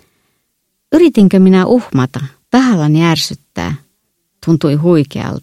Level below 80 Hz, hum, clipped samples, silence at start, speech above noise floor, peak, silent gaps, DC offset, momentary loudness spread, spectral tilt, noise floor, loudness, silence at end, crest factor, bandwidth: -46 dBFS; none; under 0.1%; 0.9 s; 56 dB; 0 dBFS; none; under 0.1%; 14 LU; -7 dB/octave; -67 dBFS; -12 LUFS; 0.05 s; 12 dB; 13.5 kHz